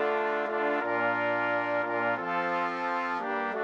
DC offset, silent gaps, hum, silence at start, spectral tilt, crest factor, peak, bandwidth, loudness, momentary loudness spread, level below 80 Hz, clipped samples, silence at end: under 0.1%; none; none; 0 s; -6 dB/octave; 12 dB; -16 dBFS; 8 kHz; -29 LUFS; 3 LU; -72 dBFS; under 0.1%; 0 s